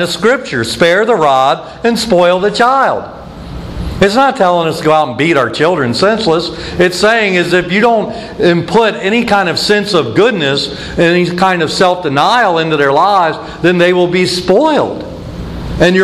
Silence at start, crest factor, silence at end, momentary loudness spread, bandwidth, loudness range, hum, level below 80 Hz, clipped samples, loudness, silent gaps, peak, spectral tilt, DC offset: 0 s; 10 dB; 0 s; 10 LU; 14 kHz; 1 LU; none; -34 dBFS; under 0.1%; -11 LUFS; none; 0 dBFS; -5 dB/octave; under 0.1%